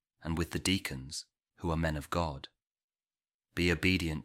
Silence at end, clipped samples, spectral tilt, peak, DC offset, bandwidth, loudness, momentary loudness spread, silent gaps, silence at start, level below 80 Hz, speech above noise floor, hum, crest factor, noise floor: 0 s; under 0.1%; -4.5 dB/octave; -16 dBFS; under 0.1%; 16.5 kHz; -33 LUFS; 13 LU; 2.71-2.75 s, 2.84-2.89 s, 3.34-3.39 s; 0.2 s; -48 dBFS; over 57 dB; none; 20 dB; under -90 dBFS